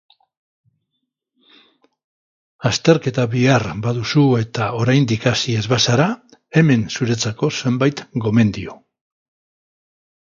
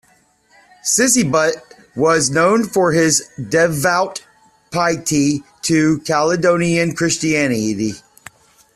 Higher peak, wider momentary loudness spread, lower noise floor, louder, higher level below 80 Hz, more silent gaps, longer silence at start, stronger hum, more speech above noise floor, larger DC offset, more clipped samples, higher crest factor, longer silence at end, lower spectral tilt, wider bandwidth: about the same, 0 dBFS vs -2 dBFS; second, 7 LU vs 10 LU; first, -76 dBFS vs -56 dBFS; about the same, -17 LUFS vs -16 LUFS; about the same, -50 dBFS vs -52 dBFS; neither; first, 2.6 s vs 0.85 s; neither; first, 59 dB vs 40 dB; neither; neither; about the same, 20 dB vs 16 dB; first, 1.5 s vs 0.75 s; first, -5.5 dB/octave vs -4 dB/octave; second, 7.6 kHz vs 14.5 kHz